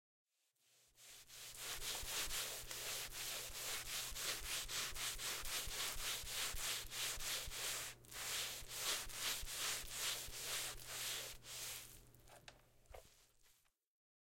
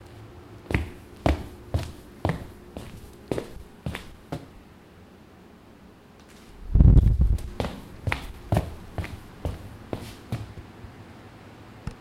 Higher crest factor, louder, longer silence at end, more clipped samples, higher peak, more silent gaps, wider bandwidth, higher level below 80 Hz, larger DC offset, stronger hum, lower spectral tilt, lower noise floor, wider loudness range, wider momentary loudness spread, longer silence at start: second, 20 dB vs 26 dB; second, -43 LUFS vs -28 LUFS; first, 0.75 s vs 0.05 s; neither; second, -28 dBFS vs -2 dBFS; neither; first, 16.5 kHz vs 14.5 kHz; second, -60 dBFS vs -30 dBFS; neither; neither; second, 0.5 dB/octave vs -7.5 dB/octave; first, -80 dBFS vs -50 dBFS; second, 5 LU vs 14 LU; second, 18 LU vs 23 LU; first, 0.95 s vs 0.1 s